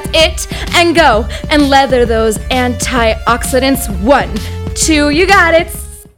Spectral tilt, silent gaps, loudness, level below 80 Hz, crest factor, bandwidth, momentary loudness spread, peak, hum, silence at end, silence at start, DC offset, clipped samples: -3.5 dB/octave; none; -10 LUFS; -22 dBFS; 10 dB; 19.5 kHz; 9 LU; 0 dBFS; none; 0.15 s; 0 s; 0.6%; 0.4%